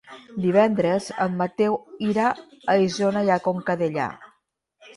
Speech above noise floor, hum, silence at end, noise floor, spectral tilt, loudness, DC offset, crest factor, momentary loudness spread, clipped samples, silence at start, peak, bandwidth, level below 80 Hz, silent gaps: 47 dB; none; 0.1 s; -69 dBFS; -6.5 dB/octave; -23 LUFS; under 0.1%; 18 dB; 7 LU; under 0.1%; 0.1 s; -4 dBFS; 11.5 kHz; -64 dBFS; none